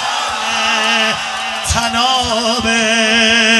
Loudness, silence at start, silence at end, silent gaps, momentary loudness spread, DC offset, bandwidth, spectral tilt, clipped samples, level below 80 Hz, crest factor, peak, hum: -13 LUFS; 0 s; 0 s; none; 7 LU; under 0.1%; 12.5 kHz; -1.5 dB/octave; under 0.1%; -36 dBFS; 14 dB; 0 dBFS; none